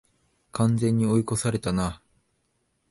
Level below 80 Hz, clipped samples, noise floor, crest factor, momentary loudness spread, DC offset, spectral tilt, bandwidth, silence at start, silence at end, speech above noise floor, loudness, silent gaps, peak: -48 dBFS; under 0.1%; -72 dBFS; 16 dB; 11 LU; under 0.1%; -6.5 dB/octave; 11.5 kHz; 0.55 s; 0.95 s; 49 dB; -25 LUFS; none; -10 dBFS